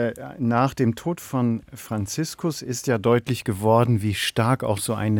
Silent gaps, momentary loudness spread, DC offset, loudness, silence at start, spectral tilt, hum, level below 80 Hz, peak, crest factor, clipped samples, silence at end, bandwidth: none; 8 LU; under 0.1%; -23 LUFS; 0 s; -5.5 dB/octave; none; -56 dBFS; -6 dBFS; 18 dB; under 0.1%; 0 s; 17.5 kHz